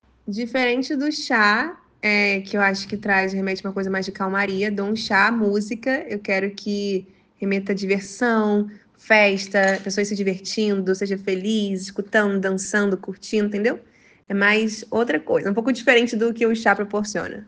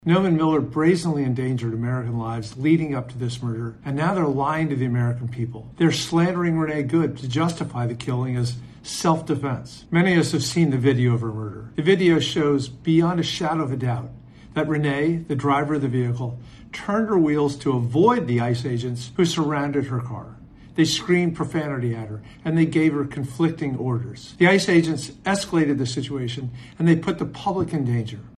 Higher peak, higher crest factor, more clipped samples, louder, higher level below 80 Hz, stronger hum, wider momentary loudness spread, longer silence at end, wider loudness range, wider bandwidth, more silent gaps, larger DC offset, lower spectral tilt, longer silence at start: about the same, -2 dBFS vs -2 dBFS; about the same, 20 dB vs 20 dB; neither; about the same, -21 LUFS vs -22 LUFS; second, -62 dBFS vs -52 dBFS; neither; about the same, 9 LU vs 11 LU; about the same, 0.05 s vs 0.05 s; about the same, 3 LU vs 3 LU; second, 9.6 kHz vs 12.5 kHz; neither; neither; second, -4.5 dB/octave vs -6 dB/octave; first, 0.25 s vs 0.05 s